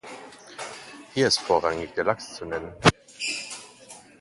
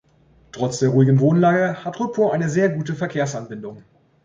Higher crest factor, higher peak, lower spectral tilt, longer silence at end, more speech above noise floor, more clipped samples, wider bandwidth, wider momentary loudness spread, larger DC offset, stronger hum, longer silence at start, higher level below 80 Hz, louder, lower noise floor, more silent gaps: first, 28 dB vs 14 dB; first, 0 dBFS vs -4 dBFS; second, -3.5 dB/octave vs -7 dB/octave; second, 0.2 s vs 0.45 s; second, 24 dB vs 36 dB; neither; first, 11.5 kHz vs 7.8 kHz; first, 21 LU vs 14 LU; neither; neither; second, 0.05 s vs 0.55 s; first, -52 dBFS vs -58 dBFS; second, -25 LUFS vs -19 LUFS; second, -48 dBFS vs -55 dBFS; neither